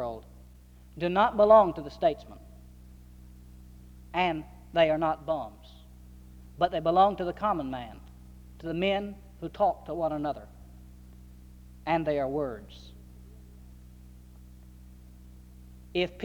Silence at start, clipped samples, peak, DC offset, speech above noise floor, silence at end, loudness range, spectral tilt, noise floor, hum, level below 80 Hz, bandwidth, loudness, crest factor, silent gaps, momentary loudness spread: 0 s; under 0.1%; -8 dBFS; under 0.1%; 25 dB; 0 s; 8 LU; -7 dB/octave; -52 dBFS; none; -50 dBFS; 18 kHz; -28 LUFS; 22 dB; none; 22 LU